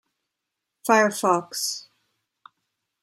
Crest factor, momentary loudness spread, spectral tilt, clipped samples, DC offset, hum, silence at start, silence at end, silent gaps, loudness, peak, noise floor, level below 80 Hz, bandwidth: 22 dB; 13 LU; -3 dB/octave; under 0.1%; under 0.1%; none; 0.85 s; 1.2 s; none; -22 LUFS; -4 dBFS; -83 dBFS; -80 dBFS; 16 kHz